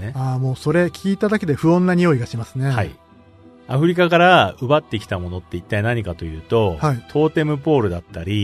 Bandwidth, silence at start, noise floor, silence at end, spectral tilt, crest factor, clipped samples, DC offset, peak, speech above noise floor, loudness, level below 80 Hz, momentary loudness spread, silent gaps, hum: 13.5 kHz; 0 s; -47 dBFS; 0 s; -7 dB/octave; 18 dB; under 0.1%; under 0.1%; 0 dBFS; 29 dB; -19 LUFS; -44 dBFS; 12 LU; none; none